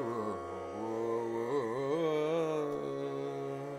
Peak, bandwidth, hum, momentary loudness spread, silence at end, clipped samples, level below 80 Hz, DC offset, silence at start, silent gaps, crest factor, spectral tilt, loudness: -22 dBFS; 14 kHz; none; 7 LU; 0 s; under 0.1%; -74 dBFS; under 0.1%; 0 s; none; 14 dB; -6.5 dB/octave; -35 LUFS